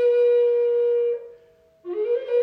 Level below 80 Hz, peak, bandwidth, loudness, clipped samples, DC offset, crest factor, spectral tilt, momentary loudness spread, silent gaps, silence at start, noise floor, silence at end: -76 dBFS; -12 dBFS; 4.6 kHz; -21 LUFS; under 0.1%; under 0.1%; 8 dB; -5.5 dB/octave; 14 LU; none; 0 s; -55 dBFS; 0 s